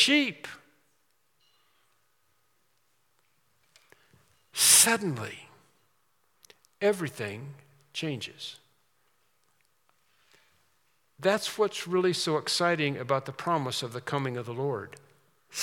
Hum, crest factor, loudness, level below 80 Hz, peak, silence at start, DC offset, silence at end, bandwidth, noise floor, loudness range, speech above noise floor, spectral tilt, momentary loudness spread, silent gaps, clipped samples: none; 26 dB; -27 LUFS; -82 dBFS; -4 dBFS; 0 s; under 0.1%; 0 s; 18 kHz; -73 dBFS; 15 LU; 44 dB; -2.5 dB/octave; 20 LU; none; under 0.1%